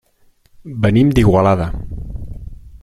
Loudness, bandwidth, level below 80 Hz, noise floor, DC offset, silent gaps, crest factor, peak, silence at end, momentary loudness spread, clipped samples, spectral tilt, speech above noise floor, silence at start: -14 LUFS; 13 kHz; -30 dBFS; -54 dBFS; under 0.1%; none; 16 dB; -2 dBFS; 0.05 s; 20 LU; under 0.1%; -8 dB/octave; 41 dB; 0.6 s